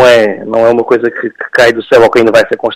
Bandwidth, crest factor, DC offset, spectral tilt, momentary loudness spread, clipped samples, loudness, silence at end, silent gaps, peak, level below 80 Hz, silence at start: 16 kHz; 8 dB; under 0.1%; -4.5 dB/octave; 7 LU; 1%; -8 LUFS; 0 s; none; 0 dBFS; -44 dBFS; 0 s